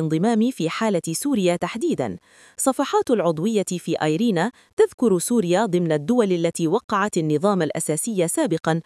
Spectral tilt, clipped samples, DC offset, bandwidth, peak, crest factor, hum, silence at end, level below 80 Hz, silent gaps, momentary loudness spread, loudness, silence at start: -5 dB/octave; under 0.1%; under 0.1%; 12 kHz; -6 dBFS; 16 dB; none; 0.05 s; -66 dBFS; 4.73-4.77 s, 4.94-4.98 s, 6.84-6.88 s; 5 LU; -21 LUFS; 0 s